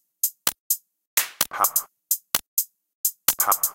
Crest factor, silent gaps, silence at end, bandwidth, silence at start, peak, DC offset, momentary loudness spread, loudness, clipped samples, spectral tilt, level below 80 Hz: 26 dB; 0.60-0.70 s, 1.07-1.17 s, 2.47-2.57 s, 2.94-3.04 s; 0 s; 17.5 kHz; 0.25 s; 0 dBFS; under 0.1%; 6 LU; -23 LUFS; under 0.1%; 1.5 dB/octave; -66 dBFS